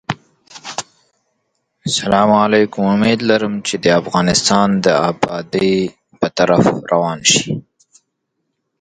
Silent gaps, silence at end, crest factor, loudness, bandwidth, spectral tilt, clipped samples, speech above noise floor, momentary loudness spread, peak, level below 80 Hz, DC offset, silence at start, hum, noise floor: none; 1.2 s; 16 dB; -15 LUFS; 9.6 kHz; -4 dB/octave; under 0.1%; 58 dB; 14 LU; 0 dBFS; -48 dBFS; under 0.1%; 0.1 s; none; -72 dBFS